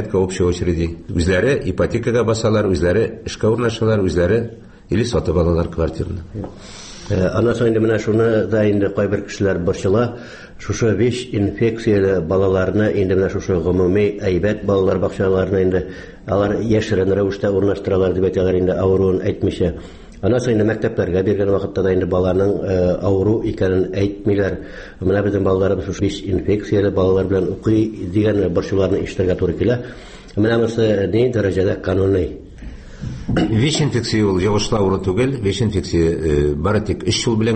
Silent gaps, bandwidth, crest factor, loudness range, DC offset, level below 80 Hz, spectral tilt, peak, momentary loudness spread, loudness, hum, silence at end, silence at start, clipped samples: none; 8.8 kHz; 12 dB; 2 LU; under 0.1%; -36 dBFS; -6.5 dB/octave; -4 dBFS; 7 LU; -18 LUFS; none; 0 s; 0 s; under 0.1%